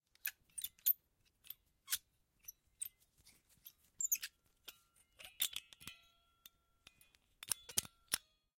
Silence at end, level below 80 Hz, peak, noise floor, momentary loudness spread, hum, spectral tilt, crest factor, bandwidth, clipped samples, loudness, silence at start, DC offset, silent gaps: 0.4 s; -78 dBFS; -14 dBFS; -77 dBFS; 21 LU; none; 1.5 dB/octave; 34 dB; 16.5 kHz; under 0.1%; -41 LUFS; 0.25 s; under 0.1%; none